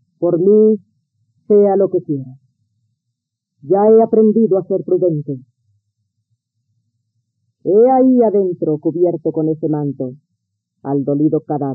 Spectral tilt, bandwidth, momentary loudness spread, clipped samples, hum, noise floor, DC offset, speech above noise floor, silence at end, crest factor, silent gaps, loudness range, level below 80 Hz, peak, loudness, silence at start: -15 dB/octave; 2.2 kHz; 14 LU; under 0.1%; none; -76 dBFS; under 0.1%; 63 dB; 0 s; 14 dB; none; 4 LU; -70 dBFS; -2 dBFS; -14 LUFS; 0.2 s